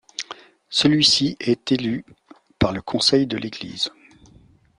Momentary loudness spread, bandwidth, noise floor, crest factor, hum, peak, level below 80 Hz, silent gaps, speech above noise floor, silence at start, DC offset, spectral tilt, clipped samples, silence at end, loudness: 17 LU; 11 kHz; -53 dBFS; 20 dB; none; -2 dBFS; -50 dBFS; none; 32 dB; 0.2 s; under 0.1%; -4 dB/octave; under 0.1%; 0.9 s; -20 LUFS